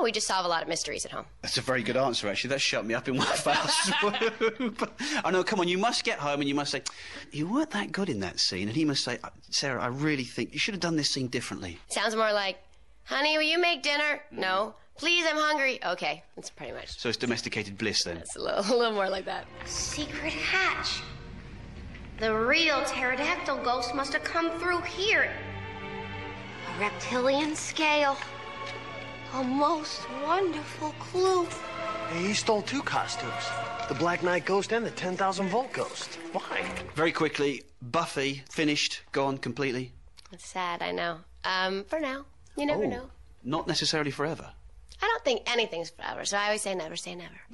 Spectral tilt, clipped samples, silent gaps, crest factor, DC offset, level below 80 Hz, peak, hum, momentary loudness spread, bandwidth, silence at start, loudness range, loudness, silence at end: -3 dB/octave; under 0.1%; none; 16 dB; 0.2%; -56 dBFS; -12 dBFS; none; 12 LU; 11.5 kHz; 0 s; 4 LU; -29 LUFS; 0 s